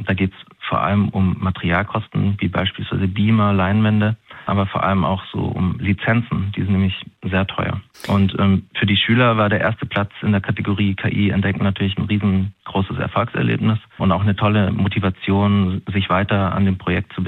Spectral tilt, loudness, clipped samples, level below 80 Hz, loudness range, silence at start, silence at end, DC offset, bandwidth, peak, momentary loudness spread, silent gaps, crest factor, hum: -8.5 dB/octave; -19 LUFS; under 0.1%; -50 dBFS; 2 LU; 0 s; 0 s; under 0.1%; 5.4 kHz; -4 dBFS; 6 LU; none; 14 dB; none